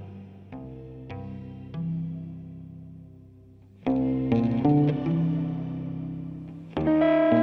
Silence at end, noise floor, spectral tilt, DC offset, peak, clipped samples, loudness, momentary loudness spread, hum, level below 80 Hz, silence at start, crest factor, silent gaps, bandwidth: 0 s; -51 dBFS; -10.5 dB/octave; under 0.1%; -10 dBFS; under 0.1%; -26 LUFS; 21 LU; none; -52 dBFS; 0 s; 18 dB; none; 5.4 kHz